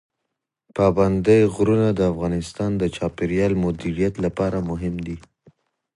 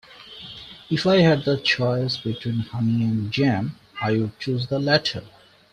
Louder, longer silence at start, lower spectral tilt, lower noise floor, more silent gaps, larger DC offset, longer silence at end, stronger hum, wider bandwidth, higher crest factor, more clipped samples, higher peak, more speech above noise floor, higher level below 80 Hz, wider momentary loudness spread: about the same, -21 LUFS vs -22 LUFS; first, 0.75 s vs 0.1 s; about the same, -7.5 dB/octave vs -6.5 dB/octave; first, -81 dBFS vs -42 dBFS; neither; neither; first, 0.8 s vs 0.45 s; neither; first, 11.5 kHz vs 10 kHz; about the same, 18 dB vs 18 dB; neither; about the same, -4 dBFS vs -4 dBFS; first, 60 dB vs 20 dB; first, -42 dBFS vs -56 dBFS; second, 11 LU vs 19 LU